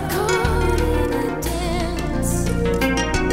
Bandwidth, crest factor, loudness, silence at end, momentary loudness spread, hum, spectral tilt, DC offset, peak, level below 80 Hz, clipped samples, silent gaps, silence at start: 16 kHz; 14 dB; -21 LUFS; 0 s; 4 LU; none; -5 dB/octave; 0.4%; -6 dBFS; -26 dBFS; under 0.1%; none; 0 s